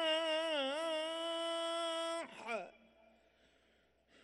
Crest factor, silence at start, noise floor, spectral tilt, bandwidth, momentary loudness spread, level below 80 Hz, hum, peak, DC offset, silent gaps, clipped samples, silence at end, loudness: 16 dB; 0 s; -73 dBFS; -1 dB/octave; 12 kHz; 9 LU; -82 dBFS; none; -24 dBFS; under 0.1%; none; under 0.1%; 1.5 s; -38 LUFS